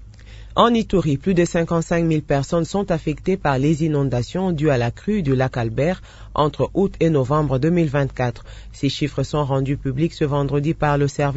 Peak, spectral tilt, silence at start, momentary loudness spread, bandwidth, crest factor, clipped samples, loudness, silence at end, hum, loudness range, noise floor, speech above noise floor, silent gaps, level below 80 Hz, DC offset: -2 dBFS; -7 dB/octave; 0 s; 5 LU; 8 kHz; 18 dB; under 0.1%; -20 LUFS; 0 s; none; 2 LU; -39 dBFS; 20 dB; none; -38 dBFS; under 0.1%